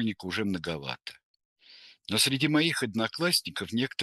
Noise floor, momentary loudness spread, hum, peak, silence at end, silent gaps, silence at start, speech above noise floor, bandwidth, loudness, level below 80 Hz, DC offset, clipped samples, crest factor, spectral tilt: -55 dBFS; 13 LU; none; -10 dBFS; 0 s; 1.23-1.34 s, 1.45-1.56 s; 0 s; 26 dB; 12.5 kHz; -28 LUFS; -66 dBFS; under 0.1%; under 0.1%; 20 dB; -3.5 dB/octave